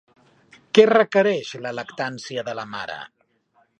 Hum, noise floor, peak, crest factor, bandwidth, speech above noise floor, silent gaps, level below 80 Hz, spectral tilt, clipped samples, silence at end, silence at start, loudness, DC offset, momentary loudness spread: none; -64 dBFS; 0 dBFS; 22 dB; 8.6 kHz; 43 dB; none; -70 dBFS; -5 dB/octave; under 0.1%; 0.75 s; 0.75 s; -21 LUFS; under 0.1%; 17 LU